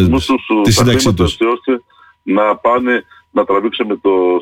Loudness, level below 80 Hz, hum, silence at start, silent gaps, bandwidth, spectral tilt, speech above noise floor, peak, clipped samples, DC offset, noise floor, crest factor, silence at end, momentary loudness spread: -14 LUFS; -34 dBFS; none; 0 s; none; 16.5 kHz; -5 dB/octave; 29 dB; -2 dBFS; under 0.1%; under 0.1%; -41 dBFS; 10 dB; 0 s; 8 LU